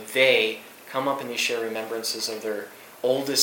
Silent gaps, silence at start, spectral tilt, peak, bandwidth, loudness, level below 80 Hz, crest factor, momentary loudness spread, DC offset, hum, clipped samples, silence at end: none; 0 s; -1.5 dB/octave; -4 dBFS; 17.5 kHz; -25 LUFS; -80 dBFS; 22 dB; 13 LU; under 0.1%; none; under 0.1%; 0 s